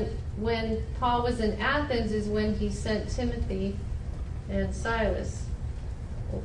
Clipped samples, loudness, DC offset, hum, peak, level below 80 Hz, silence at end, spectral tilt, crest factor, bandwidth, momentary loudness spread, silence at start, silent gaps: under 0.1%; -30 LUFS; under 0.1%; none; -14 dBFS; -36 dBFS; 0 s; -6 dB/octave; 14 dB; 11 kHz; 10 LU; 0 s; none